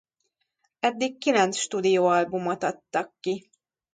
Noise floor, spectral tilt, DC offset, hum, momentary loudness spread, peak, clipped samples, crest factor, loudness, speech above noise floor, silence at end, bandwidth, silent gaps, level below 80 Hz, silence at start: -77 dBFS; -4 dB/octave; under 0.1%; none; 10 LU; -8 dBFS; under 0.1%; 18 dB; -25 LUFS; 52 dB; 0.55 s; 9.6 kHz; none; -74 dBFS; 0.85 s